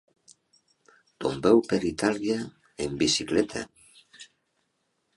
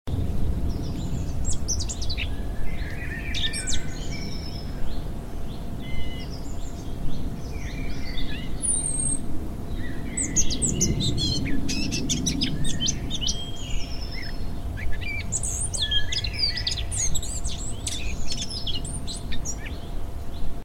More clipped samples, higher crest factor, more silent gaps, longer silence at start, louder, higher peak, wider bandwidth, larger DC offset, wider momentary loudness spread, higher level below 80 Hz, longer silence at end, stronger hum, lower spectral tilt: neither; about the same, 22 dB vs 18 dB; neither; first, 1.2 s vs 0.05 s; about the same, -26 LUFS vs -28 LUFS; about the same, -8 dBFS vs -6 dBFS; second, 11.5 kHz vs 14 kHz; neither; first, 16 LU vs 11 LU; second, -56 dBFS vs -32 dBFS; first, 0.9 s vs 0 s; neither; about the same, -4 dB/octave vs -3 dB/octave